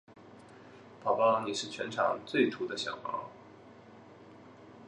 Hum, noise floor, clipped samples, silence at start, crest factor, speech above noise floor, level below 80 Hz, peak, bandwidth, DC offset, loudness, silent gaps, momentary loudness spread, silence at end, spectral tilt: none; -54 dBFS; under 0.1%; 0.1 s; 22 dB; 23 dB; -76 dBFS; -14 dBFS; 11 kHz; under 0.1%; -32 LUFS; none; 26 LU; 0 s; -4 dB/octave